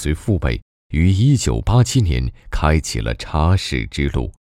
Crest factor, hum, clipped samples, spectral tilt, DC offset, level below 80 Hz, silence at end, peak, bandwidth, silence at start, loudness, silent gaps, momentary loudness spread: 16 dB; none; under 0.1%; -6 dB/octave; under 0.1%; -26 dBFS; 0.15 s; -2 dBFS; 14.5 kHz; 0 s; -19 LUFS; 0.62-0.90 s; 9 LU